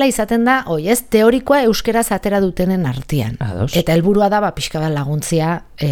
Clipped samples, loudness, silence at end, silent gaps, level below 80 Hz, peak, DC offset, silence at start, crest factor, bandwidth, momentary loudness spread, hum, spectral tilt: under 0.1%; -16 LUFS; 0 s; none; -36 dBFS; 0 dBFS; under 0.1%; 0 s; 16 dB; 19 kHz; 7 LU; none; -5.5 dB/octave